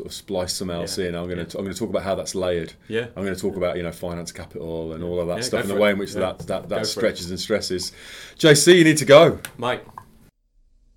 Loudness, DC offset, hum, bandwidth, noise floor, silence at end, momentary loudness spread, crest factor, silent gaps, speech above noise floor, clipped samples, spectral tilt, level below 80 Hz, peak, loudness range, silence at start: -21 LUFS; under 0.1%; none; 18 kHz; -59 dBFS; 1.05 s; 18 LU; 22 dB; none; 38 dB; under 0.1%; -4 dB/octave; -52 dBFS; 0 dBFS; 10 LU; 0 s